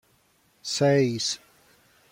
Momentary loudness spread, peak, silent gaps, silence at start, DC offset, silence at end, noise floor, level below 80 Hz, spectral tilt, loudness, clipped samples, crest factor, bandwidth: 14 LU; -10 dBFS; none; 0.65 s; under 0.1%; 0.75 s; -64 dBFS; -70 dBFS; -4.5 dB/octave; -25 LUFS; under 0.1%; 18 dB; 16.5 kHz